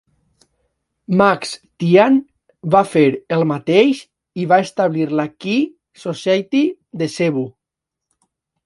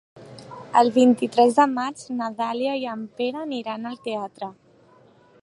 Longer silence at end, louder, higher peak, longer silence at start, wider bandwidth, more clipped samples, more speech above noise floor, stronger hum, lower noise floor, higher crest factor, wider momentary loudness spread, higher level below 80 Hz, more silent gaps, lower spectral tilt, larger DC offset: first, 1.15 s vs 0.9 s; first, -17 LUFS vs -22 LUFS; first, 0 dBFS vs -4 dBFS; first, 1.1 s vs 0.15 s; about the same, 11.5 kHz vs 11.5 kHz; neither; first, 67 dB vs 32 dB; neither; first, -83 dBFS vs -54 dBFS; about the same, 18 dB vs 20 dB; second, 13 LU vs 19 LU; first, -60 dBFS vs -74 dBFS; neither; first, -6.5 dB/octave vs -5 dB/octave; neither